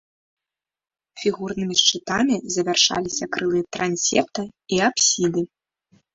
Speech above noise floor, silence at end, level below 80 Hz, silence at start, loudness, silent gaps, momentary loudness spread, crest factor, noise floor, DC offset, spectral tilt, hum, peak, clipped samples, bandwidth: over 68 dB; 0.7 s; -58 dBFS; 1.15 s; -21 LUFS; none; 9 LU; 22 dB; under -90 dBFS; under 0.1%; -2.5 dB/octave; none; -2 dBFS; under 0.1%; 8 kHz